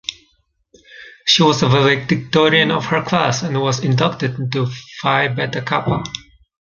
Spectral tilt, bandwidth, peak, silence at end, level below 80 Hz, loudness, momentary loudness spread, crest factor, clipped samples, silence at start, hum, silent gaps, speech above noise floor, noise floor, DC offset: -5 dB/octave; 7.4 kHz; -2 dBFS; 0.4 s; -50 dBFS; -16 LUFS; 10 LU; 16 dB; under 0.1%; 0.1 s; none; none; 46 dB; -62 dBFS; under 0.1%